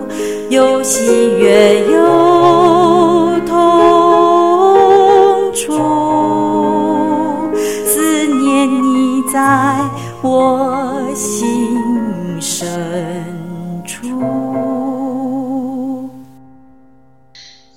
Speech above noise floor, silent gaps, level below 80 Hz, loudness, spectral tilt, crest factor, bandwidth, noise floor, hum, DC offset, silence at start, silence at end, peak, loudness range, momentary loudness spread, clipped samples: 39 dB; none; -50 dBFS; -12 LUFS; -4.5 dB/octave; 12 dB; 16.5 kHz; -48 dBFS; none; 0.8%; 0 s; 0.35 s; 0 dBFS; 11 LU; 12 LU; under 0.1%